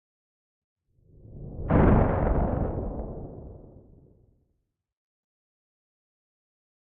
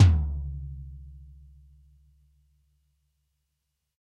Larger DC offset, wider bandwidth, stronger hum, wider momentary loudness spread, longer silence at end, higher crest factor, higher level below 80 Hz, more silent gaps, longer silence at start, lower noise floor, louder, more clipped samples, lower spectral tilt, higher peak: neither; second, 3.7 kHz vs 7 kHz; neither; second, 23 LU vs 26 LU; first, 3.35 s vs 2.75 s; about the same, 22 dB vs 22 dB; about the same, -36 dBFS vs -36 dBFS; neither; first, 1.3 s vs 0 s; about the same, -77 dBFS vs -80 dBFS; first, -25 LUFS vs -29 LUFS; neither; first, -10 dB/octave vs -7 dB/octave; about the same, -8 dBFS vs -6 dBFS